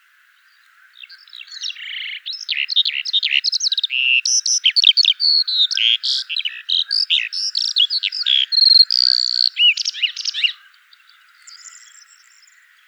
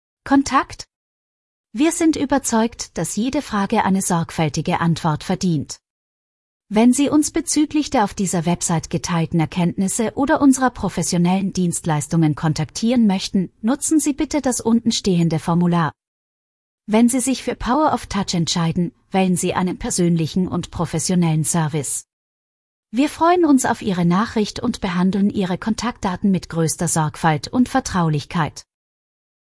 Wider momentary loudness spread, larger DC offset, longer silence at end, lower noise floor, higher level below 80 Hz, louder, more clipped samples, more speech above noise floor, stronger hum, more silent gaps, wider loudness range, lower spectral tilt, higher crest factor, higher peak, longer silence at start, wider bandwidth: first, 14 LU vs 7 LU; neither; first, 1.1 s vs 0.9 s; second, -54 dBFS vs under -90 dBFS; second, under -90 dBFS vs -46 dBFS; first, -14 LUFS vs -19 LUFS; neither; second, 37 dB vs over 72 dB; neither; second, none vs 0.96-1.64 s, 5.90-6.60 s, 16.07-16.78 s, 22.13-22.83 s; first, 7 LU vs 2 LU; second, 13 dB/octave vs -5 dB/octave; about the same, 20 dB vs 16 dB; first, 0 dBFS vs -4 dBFS; first, 1 s vs 0.25 s; first, over 20 kHz vs 12 kHz